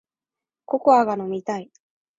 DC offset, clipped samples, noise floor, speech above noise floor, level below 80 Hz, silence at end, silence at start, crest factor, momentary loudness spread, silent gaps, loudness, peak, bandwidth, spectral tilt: under 0.1%; under 0.1%; -90 dBFS; 70 dB; -68 dBFS; 0.55 s; 0.7 s; 20 dB; 13 LU; none; -21 LUFS; -4 dBFS; 8 kHz; -6.5 dB/octave